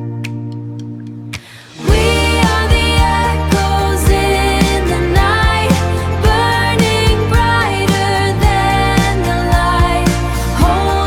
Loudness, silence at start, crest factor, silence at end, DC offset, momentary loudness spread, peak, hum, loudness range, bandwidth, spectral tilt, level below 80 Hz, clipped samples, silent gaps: -13 LUFS; 0 s; 12 dB; 0 s; 0.4%; 12 LU; 0 dBFS; none; 2 LU; 17.5 kHz; -5 dB/octave; -18 dBFS; under 0.1%; none